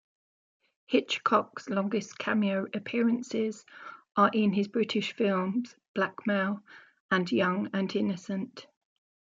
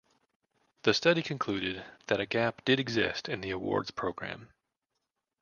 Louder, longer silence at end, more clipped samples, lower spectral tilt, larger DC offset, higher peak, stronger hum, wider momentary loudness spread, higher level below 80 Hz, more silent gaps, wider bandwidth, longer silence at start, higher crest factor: about the same, -29 LUFS vs -31 LUFS; second, 0.55 s vs 0.95 s; neither; about the same, -6 dB/octave vs -5 dB/octave; neither; about the same, -10 dBFS vs -8 dBFS; neither; about the same, 10 LU vs 11 LU; second, -78 dBFS vs -62 dBFS; first, 5.88-5.95 s, 7.00-7.09 s vs none; about the same, 7.6 kHz vs 7.2 kHz; about the same, 0.9 s vs 0.85 s; about the same, 20 dB vs 24 dB